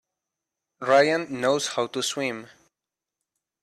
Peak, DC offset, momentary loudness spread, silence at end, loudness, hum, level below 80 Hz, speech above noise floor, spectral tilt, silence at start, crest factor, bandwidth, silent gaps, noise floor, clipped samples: -8 dBFS; under 0.1%; 12 LU; 1.15 s; -24 LUFS; none; -72 dBFS; 64 dB; -3 dB/octave; 0.8 s; 20 dB; 14 kHz; none; -88 dBFS; under 0.1%